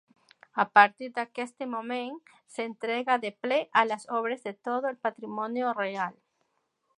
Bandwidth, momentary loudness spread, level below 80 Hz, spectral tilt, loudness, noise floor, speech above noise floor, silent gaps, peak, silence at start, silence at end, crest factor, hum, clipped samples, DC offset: 11 kHz; 13 LU; -86 dBFS; -4 dB/octave; -28 LUFS; -76 dBFS; 47 dB; none; -4 dBFS; 0.55 s; 0.85 s; 26 dB; none; under 0.1%; under 0.1%